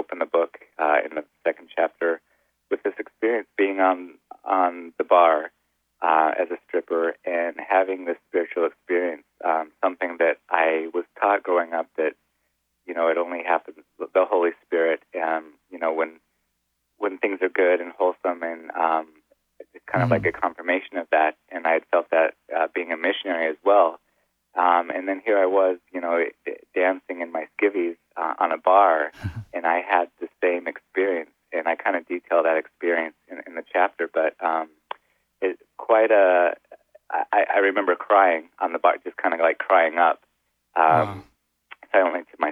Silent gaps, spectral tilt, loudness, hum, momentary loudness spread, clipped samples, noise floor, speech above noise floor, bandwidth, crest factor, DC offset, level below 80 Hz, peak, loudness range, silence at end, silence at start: none; -8 dB/octave; -23 LUFS; none; 11 LU; under 0.1%; -75 dBFS; 54 dB; 4.6 kHz; 20 dB; under 0.1%; -66 dBFS; -4 dBFS; 4 LU; 0 s; 0 s